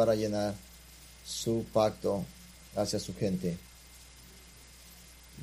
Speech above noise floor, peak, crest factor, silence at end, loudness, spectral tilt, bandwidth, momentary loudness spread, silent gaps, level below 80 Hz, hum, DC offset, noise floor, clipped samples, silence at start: 22 dB; -12 dBFS; 22 dB; 0 s; -33 LUFS; -5.5 dB/octave; 15.5 kHz; 23 LU; none; -56 dBFS; none; under 0.1%; -53 dBFS; under 0.1%; 0 s